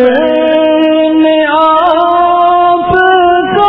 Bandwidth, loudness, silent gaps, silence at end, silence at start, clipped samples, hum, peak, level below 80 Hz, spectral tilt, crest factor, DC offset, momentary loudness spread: 5.4 kHz; -8 LUFS; none; 0 s; 0 s; 0.5%; none; 0 dBFS; -40 dBFS; -8 dB/octave; 8 dB; under 0.1%; 2 LU